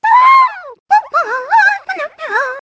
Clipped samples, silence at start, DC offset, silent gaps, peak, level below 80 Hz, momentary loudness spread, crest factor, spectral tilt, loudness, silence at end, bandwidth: under 0.1%; 0.05 s; under 0.1%; 0.80-0.86 s; 0 dBFS; -66 dBFS; 14 LU; 12 dB; -0.5 dB/octave; -12 LUFS; 0.05 s; 8 kHz